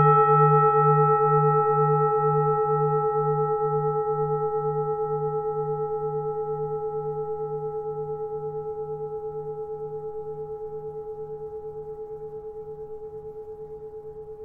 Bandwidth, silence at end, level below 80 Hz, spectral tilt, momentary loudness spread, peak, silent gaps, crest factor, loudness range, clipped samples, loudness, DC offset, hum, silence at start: 3.4 kHz; 0 s; -56 dBFS; -12 dB/octave; 19 LU; -6 dBFS; none; 18 dB; 15 LU; under 0.1%; -24 LUFS; 0.1%; none; 0 s